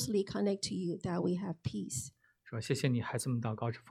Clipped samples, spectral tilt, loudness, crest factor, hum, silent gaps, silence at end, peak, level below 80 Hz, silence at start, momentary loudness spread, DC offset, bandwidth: under 0.1%; -5.5 dB/octave; -36 LUFS; 20 dB; none; none; 0 s; -16 dBFS; -66 dBFS; 0 s; 7 LU; under 0.1%; 14.5 kHz